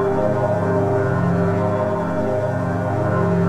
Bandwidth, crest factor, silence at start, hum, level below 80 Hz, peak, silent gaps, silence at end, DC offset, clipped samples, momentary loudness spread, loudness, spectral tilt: 9.6 kHz; 12 dB; 0 s; none; -44 dBFS; -6 dBFS; none; 0 s; under 0.1%; under 0.1%; 3 LU; -20 LUFS; -9 dB/octave